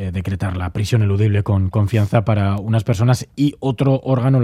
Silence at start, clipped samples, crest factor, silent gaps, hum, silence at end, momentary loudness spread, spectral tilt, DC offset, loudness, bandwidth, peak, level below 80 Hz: 0 s; under 0.1%; 16 dB; none; none; 0 s; 6 LU; -7.5 dB/octave; under 0.1%; -18 LUFS; 13 kHz; -2 dBFS; -46 dBFS